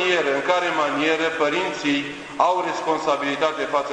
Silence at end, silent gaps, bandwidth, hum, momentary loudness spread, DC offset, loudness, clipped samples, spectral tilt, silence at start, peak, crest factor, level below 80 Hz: 0 s; none; 10.5 kHz; none; 3 LU; under 0.1%; -22 LUFS; under 0.1%; -3.5 dB/octave; 0 s; -4 dBFS; 18 dB; -62 dBFS